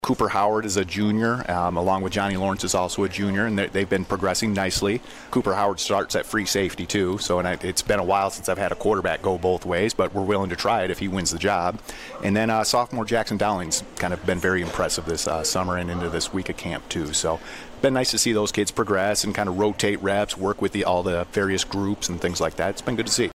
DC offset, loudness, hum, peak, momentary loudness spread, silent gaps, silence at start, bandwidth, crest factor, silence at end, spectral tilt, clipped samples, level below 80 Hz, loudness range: under 0.1%; -23 LUFS; none; -8 dBFS; 5 LU; none; 0 s; 16 kHz; 14 dB; 0 s; -4 dB/octave; under 0.1%; -46 dBFS; 2 LU